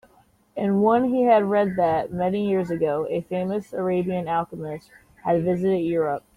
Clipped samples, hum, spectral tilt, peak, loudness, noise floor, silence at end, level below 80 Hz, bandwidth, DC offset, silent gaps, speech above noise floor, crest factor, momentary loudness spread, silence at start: under 0.1%; none; -8.5 dB/octave; -6 dBFS; -23 LUFS; -59 dBFS; 0.15 s; -58 dBFS; 13.5 kHz; under 0.1%; none; 37 dB; 16 dB; 11 LU; 0.55 s